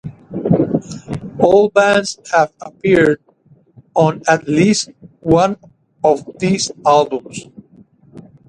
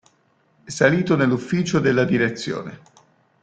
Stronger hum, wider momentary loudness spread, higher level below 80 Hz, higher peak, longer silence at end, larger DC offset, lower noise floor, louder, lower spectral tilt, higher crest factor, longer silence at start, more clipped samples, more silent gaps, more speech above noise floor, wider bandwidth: neither; first, 15 LU vs 12 LU; first, -48 dBFS vs -56 dBFS; about the same, 0 dBFS vs -2 dBFS; second, 0.3 s vs 0.65 s; neither; second, -51 dBFS vs -62 dBFS; first, -15 LUFS vs -20 LUFS; about the same, -5 dB/octave vs -6 dB/octave; about the same, 16 dB vs 20 dB; second, 0.05 s vs 0.65 s; neither; neither; second, 37 dB vs 42 dB; first, 11 kHz vs 9.2 kHz